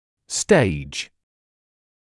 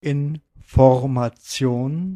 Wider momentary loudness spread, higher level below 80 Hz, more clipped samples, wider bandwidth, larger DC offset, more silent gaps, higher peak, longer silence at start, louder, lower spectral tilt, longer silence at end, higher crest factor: first, 14 LU vs 11 LU; second, -48 dBFS vs -38 dBFS; neither; second, 12 kHz vs 13.5 kHz; neither; neither; about the same, -2 dBFS vs 0 dBFS; first, 0.3 s vs 0.05 s; about the same, -21 LUFS vs -20 LUFS; second, -4.5 dB/octave vs -7 dB/octave; first, 1.05 s vs 0 s; about the same, 22 dB vs 20 dB